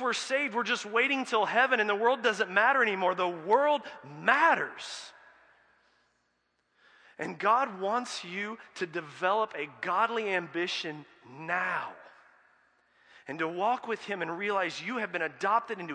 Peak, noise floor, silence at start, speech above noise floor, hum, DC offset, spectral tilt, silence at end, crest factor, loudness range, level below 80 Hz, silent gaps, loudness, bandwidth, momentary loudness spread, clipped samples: -8 dBFS; -76 dBFS; 0 s; 46 dB; none; under 0.1%; -3.5 dB/octave; 0 s; 22 dB; 9 LU; -86 dBFS; none; -29 LUFS; 10.5 kHz; 13 LU; under 0.1%